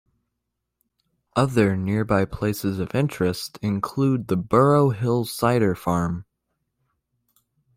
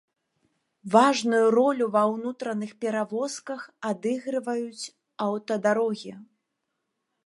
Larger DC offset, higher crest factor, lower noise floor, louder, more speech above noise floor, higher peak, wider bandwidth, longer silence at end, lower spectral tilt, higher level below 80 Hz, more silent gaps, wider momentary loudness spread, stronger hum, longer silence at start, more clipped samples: neither; about the same, 18 dB vs 22 dB; about the same, -80 dBFS vs -80 dBFS; first, -22 LUFS vs -25 LUFS; first, 59 dB vs 55 dB; about the same, -6 dBFS vs -4 dBFS; first, 16 kHz vs 11.5 kHz; first, 1.55 s vs 1 s; first, -7 dB/octave vs -4.5 dB/octave; first, -50 dBFS vs -82 dBFS; neither; second, 8 LU vs 15 LU; neither; first, 1.35 s vs 0.85 s; neither